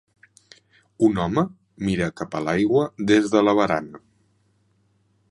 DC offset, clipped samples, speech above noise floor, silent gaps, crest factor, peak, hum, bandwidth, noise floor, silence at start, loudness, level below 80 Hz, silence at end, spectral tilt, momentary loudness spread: under 0.1%; under 0.1%; 44 dB; none; 20 dB; -4 dBFS; none; 11 kHz; -64 dBFS; 1 s; -22 LUFS; -52 dBFS; 1.35 s; -6.5 dB/octave; 10 LU